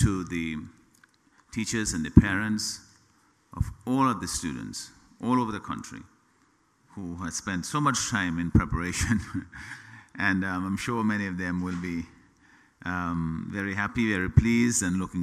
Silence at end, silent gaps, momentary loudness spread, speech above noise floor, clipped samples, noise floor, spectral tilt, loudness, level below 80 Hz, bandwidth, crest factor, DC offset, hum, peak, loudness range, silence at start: 0 s; none; 17 LU; 38 dB; under 0.1%; -65 dBFS; -5 dB/octave; -28 LUFS; -40 dBFS; 14.5 kHz; 28 dB; under 0.1%; none; 0 dBFS; 4 LU; 0 s